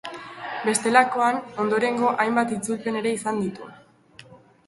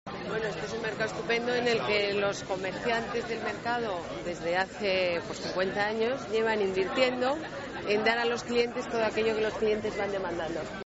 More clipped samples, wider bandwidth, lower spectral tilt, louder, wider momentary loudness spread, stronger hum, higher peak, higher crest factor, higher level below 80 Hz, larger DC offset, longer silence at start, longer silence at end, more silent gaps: neither; first, 12 kHz vs 8 kHz; first, -4 dB/octave vs -2.5 dB/octave; first, -23 LUFS vs -30 LUFS; first, 16 LU vs 7 LU; neither; first, -2 dBFS vs -12 dBFS; about the same, 22 dB vs 18 dB; second, -66 dBFS vs -58 dBFS; neither; about the same, 0.05 s vs 0.05 s; first, 0.3 s vs 0.05 s; neither